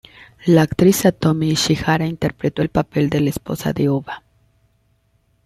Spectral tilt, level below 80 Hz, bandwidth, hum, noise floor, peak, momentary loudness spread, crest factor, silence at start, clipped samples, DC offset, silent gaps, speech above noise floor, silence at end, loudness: -5.5 dB/octave; -46 dBFS; 15 kHz; none; -62 dBFS; -2 dBFS; 10 LU; 16 dB; 0.45 s; under 0.1%; under 0.1%; none; 45 dB; 1.25 s; -18 LUFS